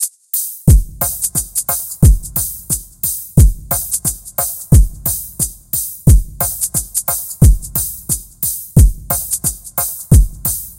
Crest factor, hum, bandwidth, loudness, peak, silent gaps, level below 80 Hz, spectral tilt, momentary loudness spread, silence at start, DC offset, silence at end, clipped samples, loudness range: 14 dB; none; 17.5 kHz; -15 LUFS; 0 dBFS; none; -18 dBFS; -5 dB/octave; 7 LU; 0 s; under 0.1%; 0.05 s; under 0.1%; 1 LU